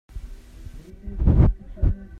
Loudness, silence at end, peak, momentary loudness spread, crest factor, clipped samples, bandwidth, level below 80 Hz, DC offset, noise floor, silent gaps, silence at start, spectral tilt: -22 LUFS; 0 s; -4 dBFS; 25 LU; 18 dB; under 0.1%; 4 kHz; -24 dBFS; under 0.1%; -40 dBFS; none; 0.15 s; -10.5 dB/octave